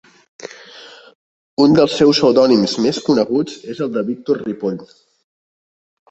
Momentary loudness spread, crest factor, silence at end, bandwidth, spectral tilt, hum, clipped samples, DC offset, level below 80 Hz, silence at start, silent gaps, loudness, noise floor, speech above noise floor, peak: 23 LU; 16 dB; 1.25 s; 8.2 kHz; -5.5 dB/octave; none; under 0.1%; under 0.1%; -56 dBFS; 0.4 s; 1.15-1.57 s; -16 LUFS; -40 dBFS; 25 dB; -2 dBFS